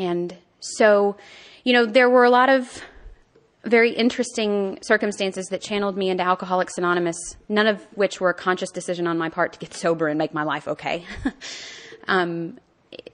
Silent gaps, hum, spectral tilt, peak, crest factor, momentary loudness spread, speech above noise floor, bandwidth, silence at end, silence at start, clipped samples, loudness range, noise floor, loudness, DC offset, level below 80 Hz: none; none; -4.5 dB/octave; -4 dBFS; 18 dB; 16 LU; 36 dB; 10 kHz; 0.15 s; 0 s; under 0.1%; 7 LU; -57 dBFS; -21 LUFS; under 0.1%; -54 dBFS